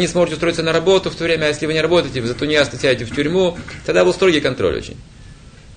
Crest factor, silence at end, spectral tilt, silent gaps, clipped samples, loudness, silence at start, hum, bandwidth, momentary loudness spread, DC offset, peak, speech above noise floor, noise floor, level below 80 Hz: 16 dB; 0 s; -5 dB/octave; none; under 0.1%; -17 LUFS; 0 s; none; 9.6 kHz; 6 LU; under 0.1%; 0 dBFS; 23 dB; -40 dBFS; -40 dBFS